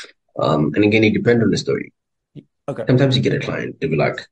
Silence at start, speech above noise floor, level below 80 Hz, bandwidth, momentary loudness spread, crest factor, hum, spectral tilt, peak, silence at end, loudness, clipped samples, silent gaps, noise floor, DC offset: 0 s; 27 dB; -52 dBFS; 8.8 kHz; 13 LU; 16 dB; none; -6.5 dB/octave; -2 dBFS; 0.1 s; -18 LUFS; under 0.1%; none; -44 dBFS; under 0.1%